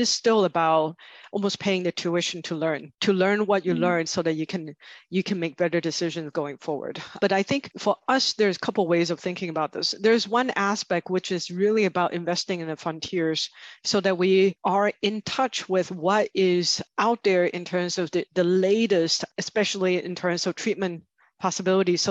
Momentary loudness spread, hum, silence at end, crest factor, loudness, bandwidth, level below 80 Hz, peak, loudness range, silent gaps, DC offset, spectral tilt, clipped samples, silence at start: 8 LU; none; 0 s; 16 dB; -24 LUFS; 8.4 kHz; -70 dBFS; -8 dBFS; 3 LU; none; under 0.1%; -4 dB/octave; under 0.1%; 0 s